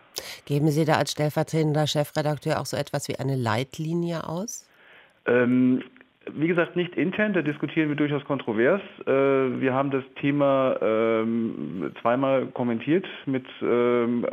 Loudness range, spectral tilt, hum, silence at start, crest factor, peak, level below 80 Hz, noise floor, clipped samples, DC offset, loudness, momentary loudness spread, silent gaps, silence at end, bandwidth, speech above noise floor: 3 LU; -6 dB/octave; none; 0.15 s; 18 dB; -6 dBFS; -68 dBFS; -54 dBFS; under 0.1%; under 0.1%; -25 LUFS; 9 LU; none; 0 s; 16 kHz; 30 dB